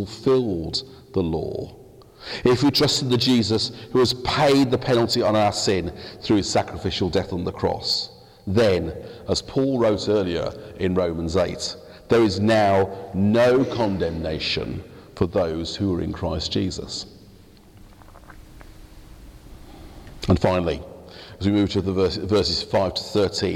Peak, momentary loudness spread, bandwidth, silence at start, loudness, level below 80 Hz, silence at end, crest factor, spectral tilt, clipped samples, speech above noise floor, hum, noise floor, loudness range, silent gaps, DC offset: -6 dBFS; 14 LU; 16.5 kHz; 0 s; -22 LUFS; -44 dBFS; 0 s; 16 dB; -5.5 dB/octave; under 0.1%; 27 dB; none; -48 dBFS; 8 LU; none; under 0.1%